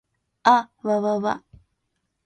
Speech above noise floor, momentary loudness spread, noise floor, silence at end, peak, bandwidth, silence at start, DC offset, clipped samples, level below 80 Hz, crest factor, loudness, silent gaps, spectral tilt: 55 dB; 9 LU; -76 dBFS; 0.85 s; -2 dBFS; 9.4 kHz; 0.45 s; under 0.1%; under 0.1%; -64 dBFS; 22 dB; -22 LUFS; none; -5 dB/octave